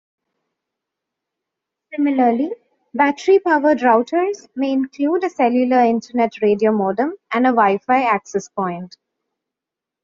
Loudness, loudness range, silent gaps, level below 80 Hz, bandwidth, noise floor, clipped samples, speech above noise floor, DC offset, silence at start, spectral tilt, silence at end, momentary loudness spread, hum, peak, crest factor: -18 LUFS; 3 LU; none; -66 dBFS; 7.6 kHz; -86 dBFS; under 0.1%; 69 dB; under 0.1%; 1.9 s; -4.5 dB/octave; 1.15 s; 10 LU; none; -2 dBFS; 18 dB